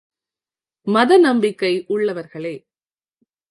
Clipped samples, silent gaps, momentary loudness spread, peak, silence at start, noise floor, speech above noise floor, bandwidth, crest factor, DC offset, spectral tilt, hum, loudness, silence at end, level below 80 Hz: under 0.1%; none; 18 LU; -2 dBFS; 0.85 s; under -90 dBFS; over 73 dB; 11.5 kHz; 18 dB; under 0.1%; -5.5 dB/octave; none; -17 LUFS; 0.95 s; -72 dBFS